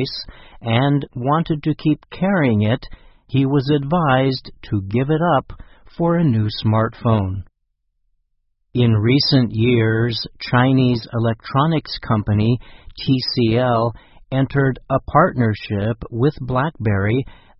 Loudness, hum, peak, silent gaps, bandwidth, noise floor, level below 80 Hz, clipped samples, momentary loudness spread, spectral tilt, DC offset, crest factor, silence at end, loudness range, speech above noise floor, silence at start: -19 LUFS; none; -2 dBFS; none; 6 kHz; -70 dBFS; -42 dBFS; under 0.1%; 8 LU; -10 dB/octave; under 0.1%; 18 dB; 0.25 s; 3 LU; 52 dB; 0 s